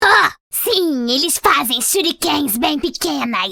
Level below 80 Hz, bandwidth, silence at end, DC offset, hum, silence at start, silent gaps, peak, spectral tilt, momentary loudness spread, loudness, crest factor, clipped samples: -48 dBFS; 19.5 kHz; 0 s; under 0.1%; none; 0 s; 0.40-0.50 s; 0 dBFS; -1 dB/octave; 6 LU; -16 LUFS; 16 dB; under 0.1%